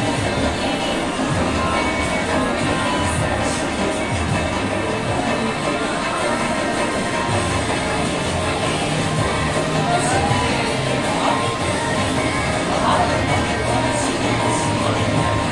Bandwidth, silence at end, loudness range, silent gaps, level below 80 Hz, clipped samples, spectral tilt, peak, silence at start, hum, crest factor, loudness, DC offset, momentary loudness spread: 11.5 kHz; 0 s; 2 LU; none; -36 dBFS; under 0.1%; -4.5 dB/octave; -4 dBFS; 0 s; none; 16 dB; -19 LUFS; under 0.1%; 3 LU